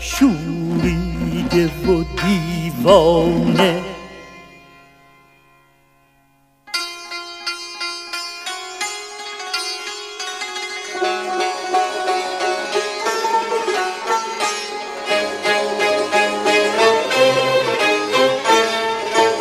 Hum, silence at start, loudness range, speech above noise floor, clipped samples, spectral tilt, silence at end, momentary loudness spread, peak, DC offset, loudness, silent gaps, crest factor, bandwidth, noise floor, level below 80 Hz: none; 0 s; 12 LU; 41 dB; under 0.1%; -4 dB/octave; 0 s; 12 LU; 0 dBFS; under 0.1%; -18 LUFS; none; 20 dB; 15.5 kHz; -57 dBFS; -40 dBFS